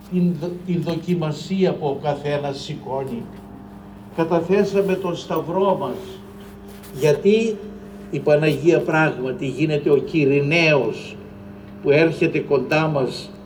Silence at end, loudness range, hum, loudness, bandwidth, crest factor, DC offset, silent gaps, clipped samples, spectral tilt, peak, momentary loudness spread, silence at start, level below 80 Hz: 0 s; 6 LU; none; -20 LUFS; over 20 kHz; 18 dB; under 0.1%; none; under 0.1%; -6.5 dB/octave; -4 dBFS; 21 LU; 0 s; -52 dBFS